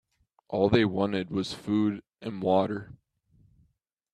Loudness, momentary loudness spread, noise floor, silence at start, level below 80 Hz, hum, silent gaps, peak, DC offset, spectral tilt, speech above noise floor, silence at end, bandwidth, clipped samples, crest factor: -28 LUFS; 13 LU; -73 dBFS; 0.5 s; -58 dBFS; none; none; -6 dBFS; under 0.1%; -7 dB/octave; 46 dB; 1.2 s; 11.5 kHz; under 0.1%; 24 dB